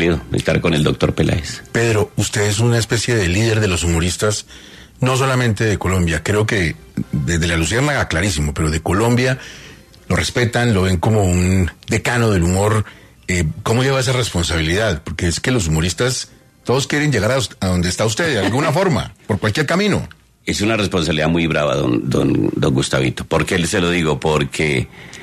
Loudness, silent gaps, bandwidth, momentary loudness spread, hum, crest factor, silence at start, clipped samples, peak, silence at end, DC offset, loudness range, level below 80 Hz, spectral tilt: -17 LUFS; none; 14 kHz; 6 LU; none; 16 dB; 0 s; under 0.1%; -2 dBFS; 0 s; under 0.1%; 1 LU; -36 dBFS; -5 dB/octave